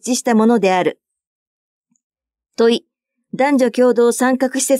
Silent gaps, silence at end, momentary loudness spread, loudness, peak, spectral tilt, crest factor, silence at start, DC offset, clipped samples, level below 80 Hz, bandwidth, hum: 1.27-1.81 s, 2.03-2.10 s; 0 s; 9 LU; -15 LUFS; -4 dBFS; -4 dB/octave; 14 dB; 0.05 s; under 0.1%; under 0.1%; -76 dBFS; 15.5 kHz; none